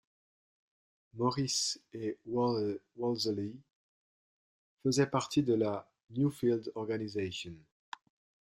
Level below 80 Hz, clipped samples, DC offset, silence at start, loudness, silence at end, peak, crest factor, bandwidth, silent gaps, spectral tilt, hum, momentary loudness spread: -72 dBFS; under 0.1%; under 0.1%; 1.15 s; -34 LUFS; 0.95 s; -16 dBFS; 20 dB; 14.5 kHz; 3.75-4.77 s; -5 dB/octave; none; 13 LU